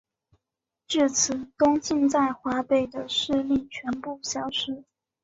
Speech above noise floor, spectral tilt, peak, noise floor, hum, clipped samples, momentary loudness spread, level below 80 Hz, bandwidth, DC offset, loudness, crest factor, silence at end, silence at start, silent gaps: 61 dB; -2.5 dB/octave; -10 dBFS; -86 dBFS; none; under 0.1%; 10 LU; -60 dBFS; 8 kHz; under 0.1%; -25 LUFS; 18 dB; 0.4 s; 0.9 s; none